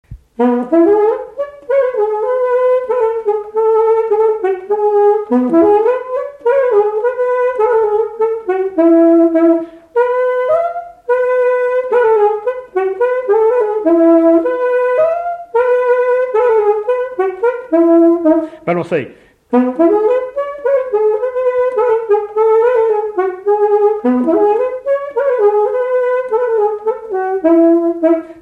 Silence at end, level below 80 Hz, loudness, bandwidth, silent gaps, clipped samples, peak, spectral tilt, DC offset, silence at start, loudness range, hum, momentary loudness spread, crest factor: 0 s; -54 dBFS; -13 LUFS; 4.1 kHz; none; under 0.1%; -2 dBFS; -8 dB/octave; under 0.1%; 0.1 s; 2 LU; none; 8 LU; 12 dB